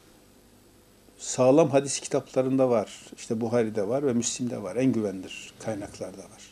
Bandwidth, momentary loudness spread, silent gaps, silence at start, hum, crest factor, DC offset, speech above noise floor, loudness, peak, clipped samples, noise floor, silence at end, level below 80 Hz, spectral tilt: 14 kHz; 17 LU; none; 1.2 s; none; 20 dB; under 0.1%; 30 dB; -26 LUFS; -8 dBFS; under 0.1%; -56 dBFS; 0.05 s; -64 dBFS; -5 dB/octave